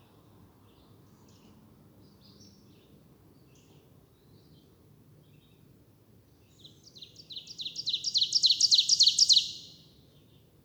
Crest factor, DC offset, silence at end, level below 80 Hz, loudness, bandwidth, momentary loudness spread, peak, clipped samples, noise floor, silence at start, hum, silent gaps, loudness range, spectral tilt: 22 dB; under 0.1%; 1 s; -72 dBFS; -23 LUFS; over 20 kHz; 24 LU; -10 dBFS; under 0.1%; -60 dBFS; 7.3 s; none; none; 18 LU; 1.5 dB/octave